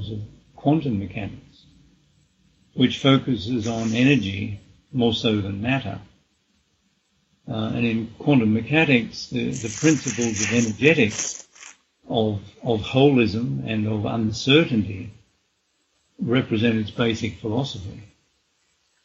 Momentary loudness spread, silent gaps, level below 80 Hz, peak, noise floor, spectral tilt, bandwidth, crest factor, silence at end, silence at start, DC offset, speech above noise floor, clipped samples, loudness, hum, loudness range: 15 LU; none; -54 dBFS; -2 dBFS; -69 dBFS; -5 dB/octave; 8.2 kHz; 22 dB; 1 s; 0 s; under 0.1%; 48 dB; under 0.1%; -22 LUFS; none; 5 LU